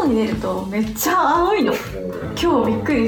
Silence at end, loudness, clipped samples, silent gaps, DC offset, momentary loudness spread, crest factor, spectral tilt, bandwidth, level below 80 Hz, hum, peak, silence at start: 0 s; -19 LUFS; under 0.1%; none; under 0.1%; 9 LU; 12 dB; -5 dB/octave; 20 kHz; -40 dBFS; none; -6 dBFS; 0 s